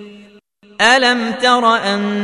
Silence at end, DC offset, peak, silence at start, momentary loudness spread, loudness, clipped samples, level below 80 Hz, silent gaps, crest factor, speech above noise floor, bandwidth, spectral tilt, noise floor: 0 s; under 0.1%; 0 dBFS; 0 s; 5 LU; -13 LUFS; under 0.1%; -58 dBFS; none; 16 dB; 33 dB; 11 kHz; -3 dB/octave; -47 dBFS